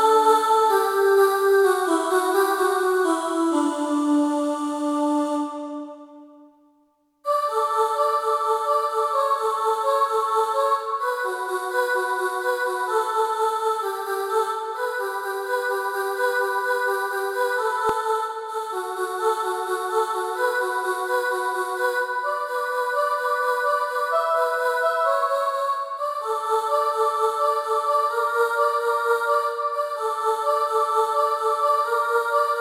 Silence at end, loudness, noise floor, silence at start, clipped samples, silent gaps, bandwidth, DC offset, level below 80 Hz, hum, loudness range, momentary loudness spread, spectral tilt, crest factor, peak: 0 s; -22 LUFS; -64 dBFS; 0 s; under 0.1%; none; 18 kHz; under 0.1%; -74 dBFS; none; 4 LU; 6 LU; -1.5 dB/octave; 16 dB; -6 dBFS